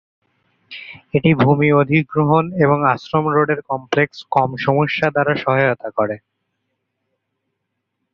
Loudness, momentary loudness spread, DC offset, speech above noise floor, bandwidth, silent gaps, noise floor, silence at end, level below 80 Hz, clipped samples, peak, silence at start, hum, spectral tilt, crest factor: -17 LUFS; 9 LU; under 0.1%; 59 dB; 6.6 kHz; none; -75 dBFS; 1.95 s; -54 dBFS; under 0.1%; 0 dBFS; 0.7 s; none; -8 dB/octave; 18 dB